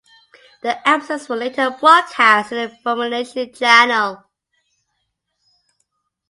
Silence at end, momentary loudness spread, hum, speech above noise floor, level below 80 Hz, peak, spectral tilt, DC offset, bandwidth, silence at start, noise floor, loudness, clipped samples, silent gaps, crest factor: 2.15 s; 13 LU; none; 56 dB; -68 dBFS; 0 dBFS; -2 dB/octave; under 0.1%; 11.5 kHz; 0.65 s; -72 dBFS; -16 LUFS; under 0.1%; none; 18 dB